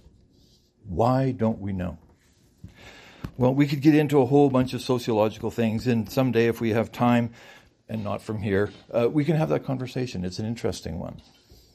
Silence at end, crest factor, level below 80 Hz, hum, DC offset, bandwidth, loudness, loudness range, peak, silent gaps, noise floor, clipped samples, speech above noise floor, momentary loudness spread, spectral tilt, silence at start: 0.55 s; 18 dB; -54 dBFS; none; under 0.1%; 15 kHz; -24 LUFS; 5 LU; -6 dBFS; none; -60 dBFS; under 0.1%; 36 dB; 14 LU; -7.5 dB/octave; 0.85 s